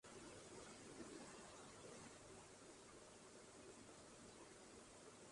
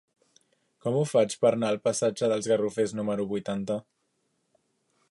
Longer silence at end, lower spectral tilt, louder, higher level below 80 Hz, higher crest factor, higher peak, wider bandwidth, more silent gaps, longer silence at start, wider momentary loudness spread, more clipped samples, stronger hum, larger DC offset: second, 0 s vs 1.3 s; second, -3 dB/octave vs -5.5 dB/octave; second, -60 LUFS vs -27 LUFS; second, -80 dBFS vs -70 dBFS; about the same, 16 dB vs 18 dB; second, -44 dBFS vs -10 dBFS; about the same, 11.5 kHz vs 11.5 kHz; neither; second, 0.05 s vs 0.85 s; second, 4 LU vs 7 LU; neither; neither; neither